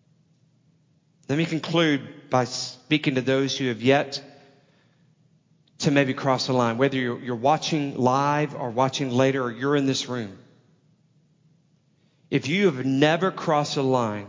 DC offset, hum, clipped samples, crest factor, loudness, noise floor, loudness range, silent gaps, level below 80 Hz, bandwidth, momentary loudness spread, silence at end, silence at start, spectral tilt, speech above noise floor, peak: under 0.1%; none; under 0.1%; 20 dB; -24 LUFS; -63 dBFS; 4 LU; none; -68 dBFS; 7.6 kHz; 7 LU; 0 s; 1.3 s; -5.5 dB/octave; 40 dB; -6 dBFS